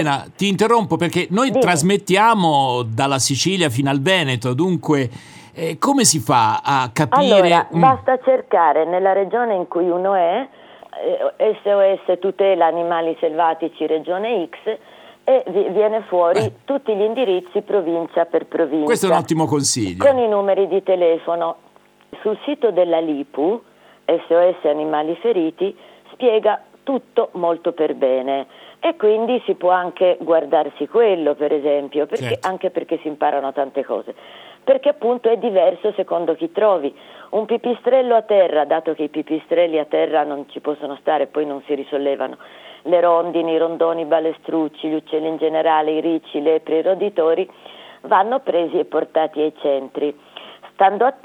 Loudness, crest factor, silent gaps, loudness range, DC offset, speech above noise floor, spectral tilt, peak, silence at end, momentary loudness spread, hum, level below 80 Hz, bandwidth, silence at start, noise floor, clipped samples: -18 LUFS; 18 dB; none; 5 LU; under 0.1%; 26 dB; -4.5 dB/octave; 0 dBFS; 0.1 s; 9 LU; none; -68 dBFS; 18 kHz; 0 s; -44 dBFS; under 0.1%